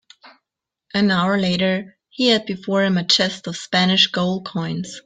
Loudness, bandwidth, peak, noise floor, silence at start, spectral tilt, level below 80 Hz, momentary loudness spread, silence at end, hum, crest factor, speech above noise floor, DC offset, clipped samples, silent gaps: -19 LUFS; 9.2 kHz; -4 dBFS; -84 dBFS; 0.25 s; -4.5 dB/octave; -60 dBFS; 10 LU; 0.05 s; none; 18 dB; 65 dB; under 0.1%; under 0.1%; none